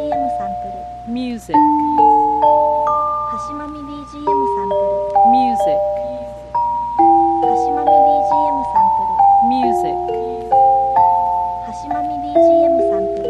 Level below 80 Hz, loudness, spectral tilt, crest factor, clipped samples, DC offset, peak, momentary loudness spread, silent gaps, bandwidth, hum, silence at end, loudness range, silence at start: -42 dBFS; -15 LUFS; -7 dB/octave; 14 dB; under 0.1%; under 0.1%; -2 dBFS; 12 LU; none; 10.5 kHz; 60 Hz at -40 dBFS; 0 s; 3 LU; 0 s